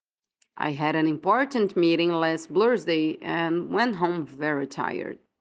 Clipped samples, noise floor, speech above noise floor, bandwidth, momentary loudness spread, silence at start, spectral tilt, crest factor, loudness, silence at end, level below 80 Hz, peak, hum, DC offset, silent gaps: under 0.1%; -73 dBFS; 48 dB; 9 kHz; 8 LU; 0.55 s; -6 dB/octave; 16 dB; -25 LUFS; 0.25 s; -72 dBFS; -8 dBFS; none; under 0.1%; none